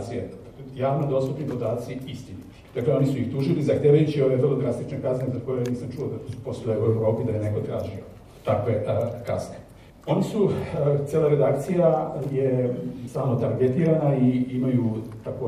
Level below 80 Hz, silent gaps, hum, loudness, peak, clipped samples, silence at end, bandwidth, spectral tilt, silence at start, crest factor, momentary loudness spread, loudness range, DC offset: -54 dBFS; none; none; -24 LUFS; -6 dBFS; under 0.1%; 0 s; 13.5 kHz; -8.5 dB/octave; 0 s; 18 dB; 13 LU; 4 LU; under 0.1%